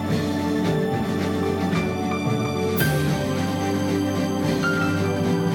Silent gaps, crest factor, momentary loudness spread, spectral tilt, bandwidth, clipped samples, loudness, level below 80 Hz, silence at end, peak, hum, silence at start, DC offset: none; 14 dB; 3 LU; -6 dB/octave; over 20 kHz; under 0.1%; -23 LUFS; -50 dBFS; 0 s; -8 dBFS; none; 0 s; under 0.1%